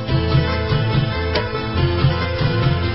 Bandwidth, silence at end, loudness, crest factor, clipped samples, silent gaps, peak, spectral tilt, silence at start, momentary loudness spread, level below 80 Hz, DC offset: 5.8 kHz; 0 s; -19 LUFS; 14 dB; under 0.1%; none; -4 dBFS; -11 dB/octave; 0 s; 3 LU; -26 dBFS; 0.8%